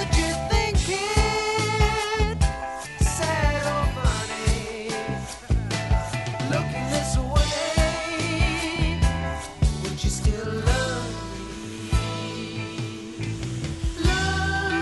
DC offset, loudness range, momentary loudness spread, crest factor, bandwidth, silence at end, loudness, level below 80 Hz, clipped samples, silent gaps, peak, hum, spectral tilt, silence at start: 0.1%; 4 LU; 9 LU; 18 dB; 11.5 kHz; 0 s; -25 LUFS; -28 dBFS; under 0.1%; none; -6 dBFS; none; -4.5 dB/octave; 0 s